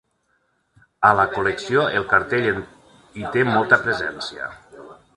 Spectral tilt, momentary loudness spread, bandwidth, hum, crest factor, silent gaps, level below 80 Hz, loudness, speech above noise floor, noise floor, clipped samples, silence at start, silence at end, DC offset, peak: -5.5 dB/octave; 17 LU; 11.5 kHz; none; 22 dB; none; -52 dBFS; -19 LUFS; 48 dB; -68 dBFS; under 0.1%; 1 s; 0.25 s; under 0.1%; 0 dBFS